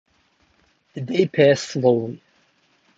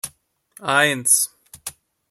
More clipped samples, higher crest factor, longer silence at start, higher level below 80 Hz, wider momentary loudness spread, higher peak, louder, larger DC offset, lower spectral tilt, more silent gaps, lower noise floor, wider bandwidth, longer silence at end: neither; about the same, 20 dB vs 20 dB; first, 0.95 s vs 0.05 s; about the same, -66 dBFS vs -64 dBFS; about the same, 20 LU vs 19 LU; about the same, -2 dBFS vs -2 dBFS; about the same, -19 LUFS vs -17 LUFS; neither; first, -6 dB/octave vs -1 dB/octave; neither; first, -62 dBFS vs -54 dBFS; second, 7.8 kHz vs 16.5 kHz; first, 0.8 s vs 0.4 s